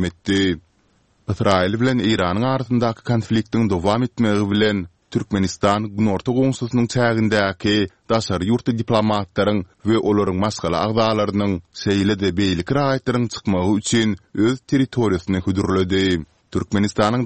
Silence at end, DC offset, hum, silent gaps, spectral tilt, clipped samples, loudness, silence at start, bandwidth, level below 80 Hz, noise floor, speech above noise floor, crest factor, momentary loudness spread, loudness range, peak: 0 s; 0.3%; none; none; -6 dB/octave; under 0.1%; -20 LUFS; 0 s; 8.8 kHz; -46 dBFS; -60 dBFS; 41 dB; 18 dB; 4 LU; 1 LU; -2 dBFS